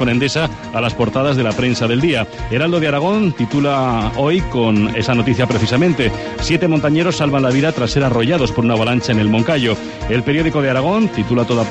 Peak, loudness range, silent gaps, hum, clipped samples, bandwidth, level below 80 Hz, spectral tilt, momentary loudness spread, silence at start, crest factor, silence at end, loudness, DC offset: -2 dBFS; 1 LU; none; none; under 0.1%; 9.4 kHz; -34 dBFS; -6 dB/octave; 4 LU; 0 s; 14 dB; 0 s; -16 LUFS; under 0.1%